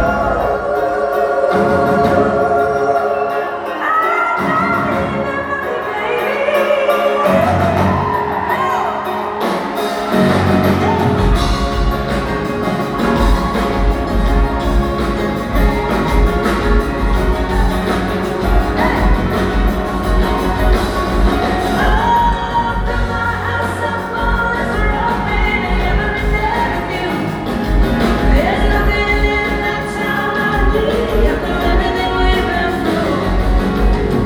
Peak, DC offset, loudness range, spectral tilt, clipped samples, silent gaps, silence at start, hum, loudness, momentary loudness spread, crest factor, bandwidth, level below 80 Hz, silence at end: 0 dBFS; under 0.1%; 2 LU; -6.5 dB/octave; under 0.1%; none; 0 s; none; -16 LUFS; 5 LU; 14 dB; 19 kHz; -20 dBFS; 0 s